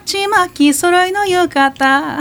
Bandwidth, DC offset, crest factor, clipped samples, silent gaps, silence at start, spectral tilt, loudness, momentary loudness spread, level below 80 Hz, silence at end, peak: 19 kHz; under 0.1%; 12 dB; under 0.1%; none; 0.05 s; -2.5 dB/octave; -13 LUFS; 3 LU; -50 dBFS; 0 s; 0 dBFS